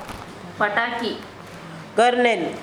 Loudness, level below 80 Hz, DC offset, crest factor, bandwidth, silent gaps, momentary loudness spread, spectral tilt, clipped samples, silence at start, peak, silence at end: -21 LUFS; -56 dBFS; under 0.1%; 18 dB; 14 kHz; none; 20 LU; -4 dB/octave; under 0.1%; 0 s; -6 dBFS; 0 s